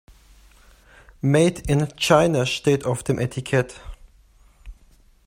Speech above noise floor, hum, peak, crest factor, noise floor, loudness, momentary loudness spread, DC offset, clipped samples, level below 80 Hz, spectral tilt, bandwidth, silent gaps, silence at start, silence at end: 34 dB; none; -2 dBFS; 20 dB; -54 dBFS; -21 LUFS; 8 LU; under 0.1%; under 0.1%; -44 dBFS; -5.5 dB/octave; 16 kHz; none; 1.25 s; 0.55 s